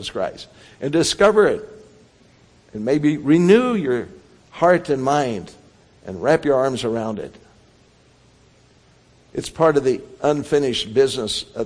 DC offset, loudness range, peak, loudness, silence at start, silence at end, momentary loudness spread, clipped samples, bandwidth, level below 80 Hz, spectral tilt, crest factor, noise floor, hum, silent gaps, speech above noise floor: under 0.1%; 6 LU; -2 dBFS; -19 LUFS; 0 s; 0 s; 17 LU; under 0.1%; 10.5 kHz; -52 dBFS; -5 dB/octave; 18 dB; -54 dBFS; none; none; 35 dB